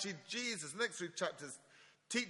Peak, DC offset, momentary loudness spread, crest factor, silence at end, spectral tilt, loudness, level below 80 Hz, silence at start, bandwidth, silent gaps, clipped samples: -22 dBFS; under 0.1%; 11 LU; 20 dB; 0 s; -2 dB/octave; -41 LUFS; -86 dBFS; 0 s; 11.5 kHz; none; under 0.1%